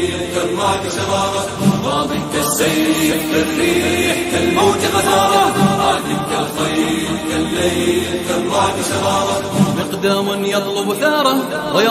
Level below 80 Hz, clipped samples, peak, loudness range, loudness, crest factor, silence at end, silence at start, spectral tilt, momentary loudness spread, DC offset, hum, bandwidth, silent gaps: -44 dBFS; under 0.1%; -2 dBFS; 3 LU; -16 LUFS; 14 dB; 0 s; 0 s; -4 dB/octave; 5 LU; under 0.1%; none; 15.5 kHz; none